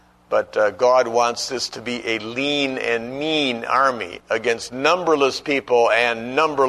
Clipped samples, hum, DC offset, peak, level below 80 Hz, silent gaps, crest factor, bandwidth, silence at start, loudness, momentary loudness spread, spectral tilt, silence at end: under 0.1%; none; under 0.1%; -2 dBFS; -58 dBFS; none; 18 dB; 13 kHz; 0.3 s; -20 LUFS; 7 LU; -3 dB/octave; 0 s